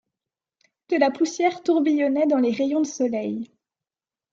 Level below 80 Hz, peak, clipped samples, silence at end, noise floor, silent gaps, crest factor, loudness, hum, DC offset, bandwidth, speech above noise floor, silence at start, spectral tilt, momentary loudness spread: -74 dBFS; -6 dBFS; under 0.1%; 0.9 s; under -90 dBFS; none; 18 dB; -22 LUFS; none; under 0.1%; 7.8 kHz; over 68 dB; 0.9 s; -4.5 dB/octave; 8 LU